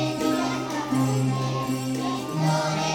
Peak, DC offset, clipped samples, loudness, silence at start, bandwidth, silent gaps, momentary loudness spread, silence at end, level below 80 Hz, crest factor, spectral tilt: -12 dBFS; under 0.1%; under 0.1%; -25 LUFS; 0 s; 17 kHz; none; 4 LU; 0 s; -58 dBFS; 12 dB; -5.5 dB/octave